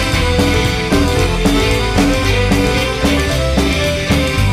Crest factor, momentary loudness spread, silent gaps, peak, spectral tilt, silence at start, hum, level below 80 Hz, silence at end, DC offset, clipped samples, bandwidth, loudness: 10 dB; 1 LU; none; -2 dBFS; -5 dB/octave; 0 s; none; -20 dBFS; 0 s; under 0.1%; under 0.1%; 16 kHz; -14 LUFS